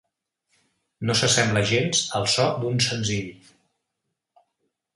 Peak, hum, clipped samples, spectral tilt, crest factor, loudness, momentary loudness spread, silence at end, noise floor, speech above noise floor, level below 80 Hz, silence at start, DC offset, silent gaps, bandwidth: -6 dBFS; none; under 0.1%; -3.5 dB/octave; 20 dB; -22 LUFS; 10 LU; 1.6 s; -81 dBFS; 58 dB; -56 dBFS; 1 s; under 0.1%; none; 11.5 kHz